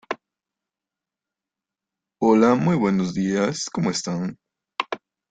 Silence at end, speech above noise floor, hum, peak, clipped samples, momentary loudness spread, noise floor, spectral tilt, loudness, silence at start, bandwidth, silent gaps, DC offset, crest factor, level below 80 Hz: 0.35 s; 68 dB; none; -4 dBFS; under 0.1%; 16 LU; -88 dBFS; -5.5 dB/octave; -22 LUFS; 0.1 s; 9.4 kHz; none; under 0.1%; 20 dB; -60 dBFS